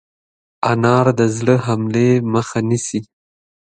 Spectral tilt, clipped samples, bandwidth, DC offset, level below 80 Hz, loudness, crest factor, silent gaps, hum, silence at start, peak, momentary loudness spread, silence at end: -6.5 dB/octave; under 0.1%; 9.4 kHz; under 0.1%; -54 dBFS; -17 LUFS; 18 dB; none; none; 0.6 s; 0 dBFS; 7 LU; 0.75 s